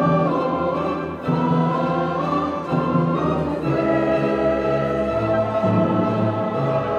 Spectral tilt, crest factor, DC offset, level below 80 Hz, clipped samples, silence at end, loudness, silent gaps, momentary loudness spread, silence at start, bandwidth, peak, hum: -9 dB/octave; 14 dB; under 0.1%; -44 dBFS; under 0.1%; 0 s; -21 LUFS; none; 3 LU; 0 s; 7.6 kHz; -6 dBFS; none